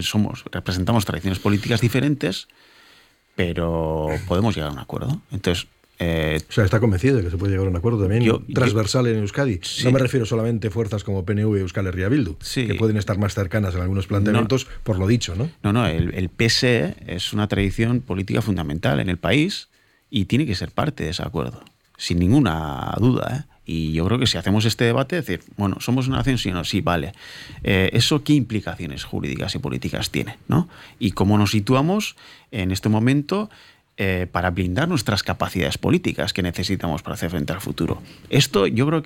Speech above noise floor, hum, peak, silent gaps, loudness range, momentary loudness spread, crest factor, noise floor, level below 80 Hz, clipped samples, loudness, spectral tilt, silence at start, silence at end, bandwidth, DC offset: 33 dB; none; -6 dBFS; none; 3 LU; 9 LU; 16 dB; -54 dBFS; -40 dBFS; under 0.1%; -22 LUFS; -6 dB/octave; 0 s; 0 s; 16.5 kHz; under 0.1%